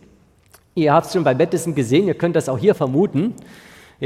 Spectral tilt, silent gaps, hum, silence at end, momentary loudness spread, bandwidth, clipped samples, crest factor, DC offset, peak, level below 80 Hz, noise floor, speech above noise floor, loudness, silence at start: -6.5 dB/octave; none; none; 0 s; 7 LU; 15.5 kHz; under 0.1%; 18 dB; under 0.1%; -2 dBFS; -56 dBFS; -53 dBFS; 35 dB; -18 LUFS; 0.75 s